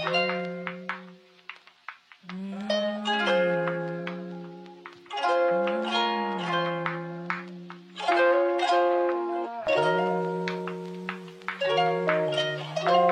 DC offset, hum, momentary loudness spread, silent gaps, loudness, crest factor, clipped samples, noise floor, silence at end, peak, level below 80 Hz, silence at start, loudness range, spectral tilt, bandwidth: under 0.1%; none; 20 LU; none; -27 LUFS; 18 dB; under 0.1%; -50 dBFS; 0 s; -8 dBFS; -76 dBFS; 0 s; 4 LU; -5.5 dB/octave; 9.8 kHz